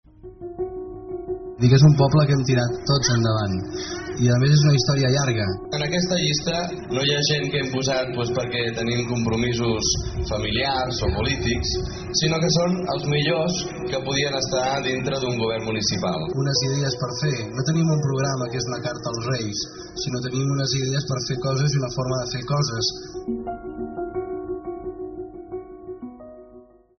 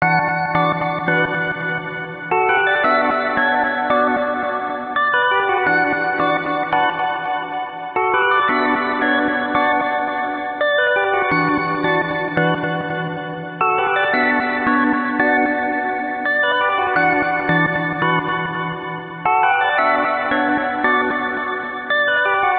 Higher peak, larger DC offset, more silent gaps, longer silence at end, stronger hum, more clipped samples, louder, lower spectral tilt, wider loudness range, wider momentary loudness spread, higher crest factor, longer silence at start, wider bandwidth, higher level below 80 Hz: second, -6 dBFS vs -2 dBFS; neither; neither; first, 0.35 s vs 0 s; neither; neither; second, -22 LUFS vs -18 LUFS; second, -5 dB/octave vs -9 dB/octave; first, 6 LU vs 1 LU; first, 13 LU vs 8 LU; about the same, 18 dB vs 16 dB; first, 0.25 s vs 0 s; first, 6.6 kHz vs 4.9 kHz; first, -42 dBFS vs -54 dBFS